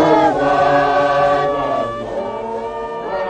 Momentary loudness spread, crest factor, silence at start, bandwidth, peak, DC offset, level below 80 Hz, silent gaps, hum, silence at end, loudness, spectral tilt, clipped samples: 11 LU; 14 dB; 0 s; 9.2 kHz; -2 dBFS; under 0.1%; -44 dBFS; none; none; 0 s; -17 LUFS; -6 dB/octave; under 0.1%